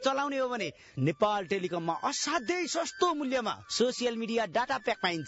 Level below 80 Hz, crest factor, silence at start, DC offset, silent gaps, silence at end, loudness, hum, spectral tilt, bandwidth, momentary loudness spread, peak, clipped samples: -68 dBFS; 18 dB; 0 s; under 0.1%; none; 0 s; -31 LUFS; none; -4 dB/octave; 8 kHz; 4 LU; -14 dBFS; under 0.1%